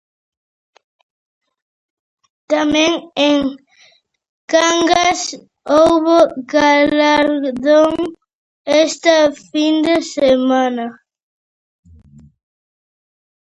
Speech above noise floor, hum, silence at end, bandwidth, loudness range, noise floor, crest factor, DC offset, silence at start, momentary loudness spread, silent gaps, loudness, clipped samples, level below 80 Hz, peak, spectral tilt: 39 dB; none; 2.5 s; 11 kHz; 6 LU; -52 dBFS; 16 dB; under 0.1%; 2.5 s; 10 LU; 4.29-4.48 s, 8.33-8.65 s; -14 LUFS; under 0.1%; -52 dBFS; 0 dBFS; -3 dB/octave